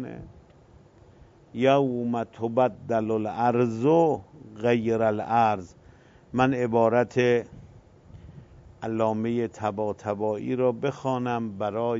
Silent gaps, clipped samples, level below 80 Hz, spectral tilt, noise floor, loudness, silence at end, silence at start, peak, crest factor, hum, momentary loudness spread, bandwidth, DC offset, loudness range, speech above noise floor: none; under 0.1%; -60 dBFS; -7.5 dB/octave; -54 dBFS; -25 LUFS; 0 s; 0 s; -8 dBFS; 18 dB; none; 8 LU; 7.8 kHz; under 0.1%; 4 LU; 29 dB